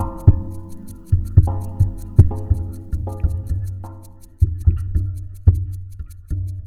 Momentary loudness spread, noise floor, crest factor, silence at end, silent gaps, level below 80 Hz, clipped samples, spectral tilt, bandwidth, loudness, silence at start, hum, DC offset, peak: 19 LU; -39 dBFS; 18 dB; 0 s; none; -24 dBFS; under 0.1%; -10 dB/octave; 10.5 kHz; -21 LUFS; 0 s; none; under 0.1%; 0 dBFS